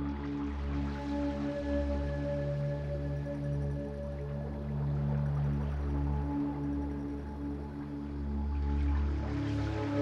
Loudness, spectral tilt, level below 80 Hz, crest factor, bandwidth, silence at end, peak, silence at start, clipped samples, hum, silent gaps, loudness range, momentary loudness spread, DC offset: -35 LUFS; -9 dB/octave; -38 dBFS; 12 dB; 6.8 kHz; 0 s; -22 dBFS; 0 s; under 0.1%; none; none; 1 LU; 7 LU; under 0.1%